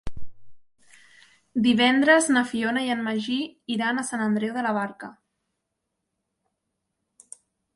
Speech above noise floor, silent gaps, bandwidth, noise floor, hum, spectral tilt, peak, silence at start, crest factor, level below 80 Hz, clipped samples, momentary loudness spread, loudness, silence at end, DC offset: 57 dB; none; 11.5 kHz; -81 dBFS; none; -3.5 dB/octave; -6 dBFS; 0.05 s; 20 dB; -54 dBFS; under 0.1%; 14 LU; -23 LUFS; 2.65 s; under 0.1%